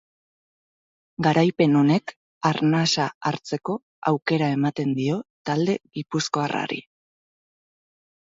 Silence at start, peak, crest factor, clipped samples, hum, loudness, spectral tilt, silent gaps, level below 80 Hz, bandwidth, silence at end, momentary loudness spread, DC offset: 1.2 s; -6 dBFS; 18 dB; under 0.1%; none; -23 LUFS; -5.5 dB/octave; 2.16-2.41 s, 3.15-3.21 s, 3.82-4.02 s, 5.30-5.45 s; -66 dBFS; 7.8 kHz; 1.45 s; 10 LU; under 0.1%